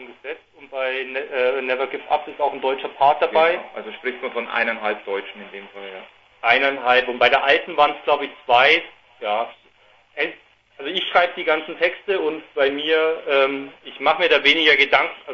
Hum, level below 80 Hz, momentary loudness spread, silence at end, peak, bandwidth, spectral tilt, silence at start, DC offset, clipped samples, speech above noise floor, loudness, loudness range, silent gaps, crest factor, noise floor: none; -64 dBFS; 19 LU; 0 s; 0 dBFS; 7.2 kHz; -3.5 dB/octave; 0 s; under 0.1%; under 0.1%; 35 dB; -19 LUFS; 6 LU; none; 20 dB; -55 dBFS